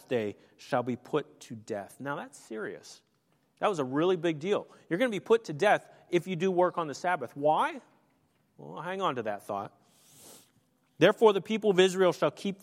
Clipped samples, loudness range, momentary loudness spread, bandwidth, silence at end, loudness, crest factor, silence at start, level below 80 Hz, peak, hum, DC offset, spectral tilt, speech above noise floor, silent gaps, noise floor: under 0.1%; 8 LU; 15 LU; 15.5 kHz; 0.1 s; -29 LUFS; 22 dB; 0.1 s; -82 dBFS; -8 dBFS; none; under 0.1%; -5.5 dB/octave; 42 dB; none; -71 dBFS